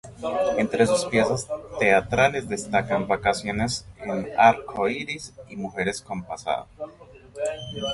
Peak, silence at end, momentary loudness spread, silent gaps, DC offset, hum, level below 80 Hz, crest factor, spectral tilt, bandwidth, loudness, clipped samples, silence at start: -4 dBFS; 0 s; 14 LU; none; under 0.1%; none; -50 dBFS; 22 dB; -4.5 dB/octave; 11.5 kHz; -24 LUFS; under 0.1%; 0.05 s